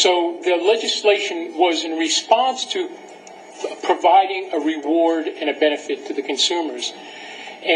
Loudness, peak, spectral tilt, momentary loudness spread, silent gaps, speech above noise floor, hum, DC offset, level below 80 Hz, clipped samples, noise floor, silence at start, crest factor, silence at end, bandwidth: -19 LUFS; 0 dBFS; -0.5 dB/octave; 15 LU; none; 21 dB; none; under 0.1%; -78 dBFS; under 0.1%; -40 dBFS; 0 s; 20 dB; 0 s; 10.5 kHz